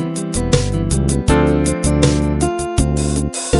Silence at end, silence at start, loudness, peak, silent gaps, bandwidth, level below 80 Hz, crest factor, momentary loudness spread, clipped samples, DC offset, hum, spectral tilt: 0 s; 0 s; -16 LUFS; 0 dBFS; none; 12 kHz; -22 dBFS; 16 dB; 4 LU; under 0.1%; under 0.1%; none; -5.5 dB/octave